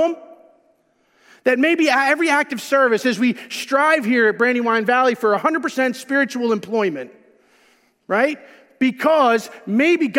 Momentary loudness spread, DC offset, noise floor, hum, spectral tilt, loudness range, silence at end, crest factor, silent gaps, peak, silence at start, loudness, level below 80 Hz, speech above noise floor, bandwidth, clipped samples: 7 LU; under 0.1%; -61 dBFS; none; -4 dB/octave; 5 LU; 0 s; 16 dB; none; -4 dBFS; 0 s; -18 LUFS; -78 dBFS; 44 dB; 16.5 kHz; under 0.1%